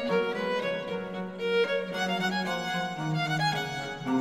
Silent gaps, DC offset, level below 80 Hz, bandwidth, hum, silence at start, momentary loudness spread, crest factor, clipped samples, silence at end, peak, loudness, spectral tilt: none; under 0.1%; -64 dBFS; 16 kHz; none; 0 s; 7 LU; 16 dB; under 0.1%; 0 s; -14 dBFS; -30 LUFS; -5 dB/octave